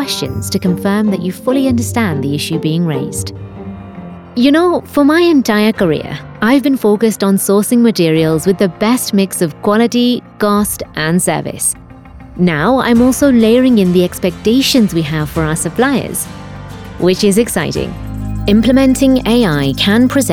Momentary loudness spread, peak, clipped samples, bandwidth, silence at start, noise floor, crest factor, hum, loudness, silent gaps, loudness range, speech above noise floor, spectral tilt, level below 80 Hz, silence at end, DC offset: 12 LU; 0 dBFS; under 0.1%; 18 kHz; 0 s; -34 dBFS; 12 dB; none; -12 LUFS; none; 4 LU; 22 dB; -5 dB/octave; -34 dBFS; 0 s; under 0.1%